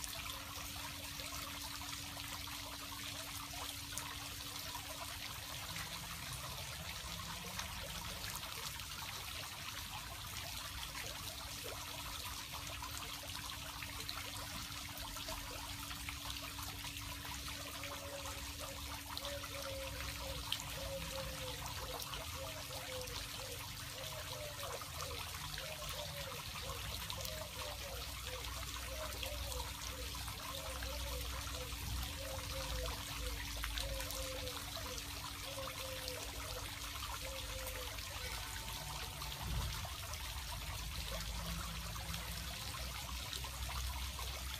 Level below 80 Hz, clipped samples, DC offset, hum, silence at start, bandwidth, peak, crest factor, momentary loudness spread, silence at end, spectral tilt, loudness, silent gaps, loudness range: -52 dBFS; under 0.1%; under 0.1%; none; 0 s; 15.5 kHz; -18 dBFS; 26 dB; 2 LU; 0 s; -2.5 dB/octave; -44 LUFS; none; 2 LU